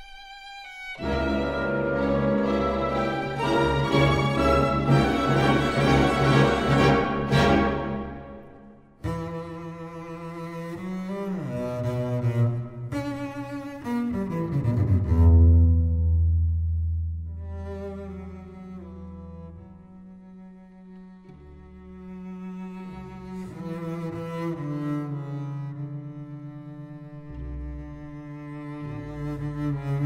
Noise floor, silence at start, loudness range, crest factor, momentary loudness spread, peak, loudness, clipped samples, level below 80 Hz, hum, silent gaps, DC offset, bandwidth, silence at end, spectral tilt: -49 dBFS; 0 s; 19 LU; 20 dB; 20 LU; -6 dBFS; -25 LUFS; under 0.1%; -34 dBFS; none; none; under 0.1%; 11 kHz; 0 s; -7.5 dB/octave